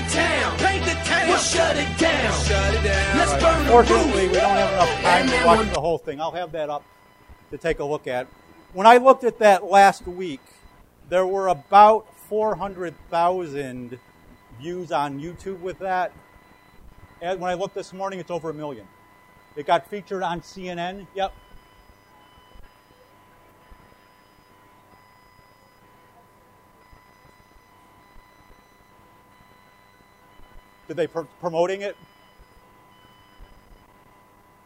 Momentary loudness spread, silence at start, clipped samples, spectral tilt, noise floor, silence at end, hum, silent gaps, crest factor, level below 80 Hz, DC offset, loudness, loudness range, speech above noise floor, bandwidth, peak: 19 LU; 0 s; under 0.1%; -4 dB/octave; -54 dBFS; 1.2 s; none; none; 22 dB; -38 dBFS; under 0.1%; -20 LUFS; 14 LU; 34 dB; 16 kHz; 0 dBFS